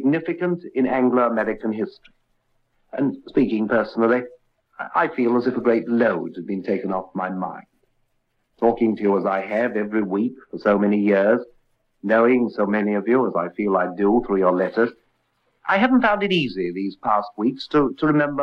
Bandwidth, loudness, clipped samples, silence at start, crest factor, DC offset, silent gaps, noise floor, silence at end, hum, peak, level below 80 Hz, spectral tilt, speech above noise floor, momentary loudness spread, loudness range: 6.2 kHz; -21 LUFS; under 0.1%; 0 s; 16 dB; under 0.1%; none; -69 dBFS; 0 s; none; -4 dBFS; -56 dBFS; -8.5 dB/octave; 49 dB; 9 LU; 4 LU